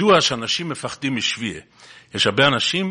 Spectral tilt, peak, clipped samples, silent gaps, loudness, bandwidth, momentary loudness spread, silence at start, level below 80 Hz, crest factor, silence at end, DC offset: -3.5 dB/octave; 0 dBFS; under 0.1%; none; -19 LUFS; 10.5 kHz; 13 LU; 0 s; -56 dBFS; 20 dB; 0 s; under 0.1%